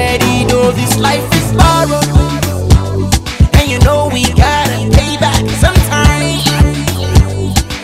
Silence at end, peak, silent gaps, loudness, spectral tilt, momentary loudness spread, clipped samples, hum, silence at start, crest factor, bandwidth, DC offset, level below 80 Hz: 0 s; 0 dBFS; none; -11 LUFS; -5 dB/octave; 4 LU; 1%; none; 0 s; 10 dB; 16.5 kHz; 0.3%; -16 dBFS